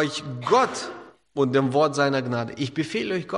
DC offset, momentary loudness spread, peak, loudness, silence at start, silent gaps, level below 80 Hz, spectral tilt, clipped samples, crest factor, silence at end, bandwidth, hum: under 0.1%; 12 LU; -6 dBFS; -24 LUFS; 0 s; none; -66 dBFS; -5.5 dB/octave; under 0.1%; 18 dB; 0 s; 11.5 kHz; none